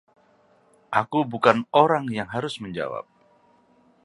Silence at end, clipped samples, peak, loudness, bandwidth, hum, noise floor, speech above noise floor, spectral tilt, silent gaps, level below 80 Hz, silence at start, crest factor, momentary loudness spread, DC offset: 1.05 s; under 0.1%; 0 dBFS; -23 LUFS; 11.5 kHz; none; -60 dBFS; 37 dB; -6 dB/octave; none; -64 dBFS; 0.9 s; 26 dB; 12 LU; under 0.1%